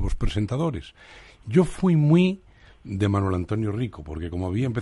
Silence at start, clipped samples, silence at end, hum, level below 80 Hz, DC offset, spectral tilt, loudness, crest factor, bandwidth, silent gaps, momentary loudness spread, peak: 0 s; under 0.1%; 0 s; none; -36 dBFS; under 0.1%; -8 dB/octave; -24 LUFS; 18 dB; 11.5 kHz; none; 16 LU; -6 dBFS